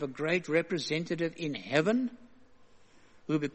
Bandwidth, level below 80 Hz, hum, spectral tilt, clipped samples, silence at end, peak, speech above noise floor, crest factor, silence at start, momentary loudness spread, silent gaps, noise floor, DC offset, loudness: 8.4 kHz; -70 dBFS; none; -5.5 dB/octave; under 0.1%; 0.05 s; -12 dBFS; 26 dB; 20 dB; 0 s; 8 LU; none; -57 dBFS; under 0.1%; -31 LUFS